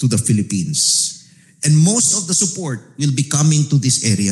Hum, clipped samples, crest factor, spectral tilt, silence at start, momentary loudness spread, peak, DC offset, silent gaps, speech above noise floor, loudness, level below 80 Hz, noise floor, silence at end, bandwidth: none; under 0.1%; 12 dB; -4 dB/octave; 0 s; 9 LU; -4 dBFS; under 0.1%; none; 28 dB; -15 LUFS; -58 dBFS; -43 dBFS; 0 s; 12.5 kHz